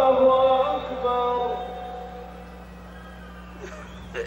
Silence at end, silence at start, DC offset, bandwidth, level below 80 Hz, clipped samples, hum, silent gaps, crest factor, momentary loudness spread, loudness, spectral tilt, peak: 0 s; 0 s; under 0.1%; 7.6 kHz; -46 dBFS; under 0.1%; 60 Hz at -45 dBFS; none; 16 dB; 24 LU; -22 LUFS; -6 dB/octave; -8 dBFS